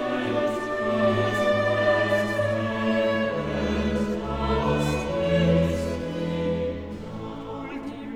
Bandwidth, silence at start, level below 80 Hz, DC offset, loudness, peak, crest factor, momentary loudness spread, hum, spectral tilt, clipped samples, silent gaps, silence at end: 15 kHz; 0 s; -40 dBFS; under 0.1%; -25 LUFS; -10 dBFS; 16 dB; 13 LU; none; -6.5 dB/octave; under 0.1%; none; 0 s